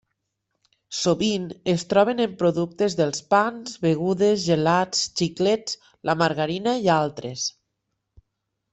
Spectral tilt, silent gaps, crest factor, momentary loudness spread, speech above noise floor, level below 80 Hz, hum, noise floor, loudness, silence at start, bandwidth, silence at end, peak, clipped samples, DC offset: -4.5 dB/octave; none; 18 dB; 8 LU; 56 dB; -60 dBFS; none; -79 dBFS; -23 LUFS; 0.9 s; 8.4 kHz; 1.2 s; -4 dBFS; under 0.1%; under 0.1%